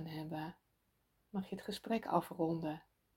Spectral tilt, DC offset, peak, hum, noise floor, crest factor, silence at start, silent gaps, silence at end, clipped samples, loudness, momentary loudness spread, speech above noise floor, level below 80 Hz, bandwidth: -6.5 dB/octave; under 0.1%; -18 dBFS; none; -79 dBFS; 24 dB; 0 s; none; 0.35 s; under 0.1%; -41 LUFS; 10 LU; 40 dB; -72 dBFS; 16.5 kHz